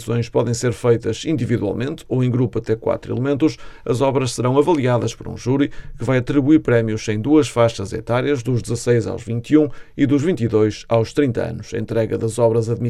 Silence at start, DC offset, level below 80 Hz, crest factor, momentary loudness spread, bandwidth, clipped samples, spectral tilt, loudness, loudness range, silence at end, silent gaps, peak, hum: 0 s; under 0.1%; -42 dBFS; 16 dB; 7 LU; 12.5 kHz; under 0.1%; -7 dB/octave; -19 LUFS; 2 LU; 0 s; none; -2 dBFS; none